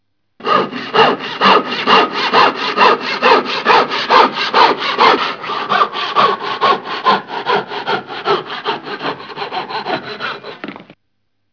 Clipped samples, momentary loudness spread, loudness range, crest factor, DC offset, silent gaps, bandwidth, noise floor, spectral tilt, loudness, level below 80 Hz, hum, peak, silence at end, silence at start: 0.2%; 12 LU; 10 LU; 14 dB; under 0.1%; none; 5.4 kHz; -71 dBFS; -4 dB/octave; -14 LUFS; -62 dBFS; none; 0 dBFS; 0.7 s; 0.4 s